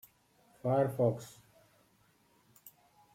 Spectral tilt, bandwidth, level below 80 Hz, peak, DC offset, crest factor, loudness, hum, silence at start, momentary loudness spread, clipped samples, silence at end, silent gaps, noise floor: -8 dB/octave; 16.5 kHz; -74 dBFS; -18 dBFS; under 0.1%; 20 dB; -33 LUFS; none; 0.65 s; 26 LU; under 0.1%; 0.45 s; none; -69 dBFS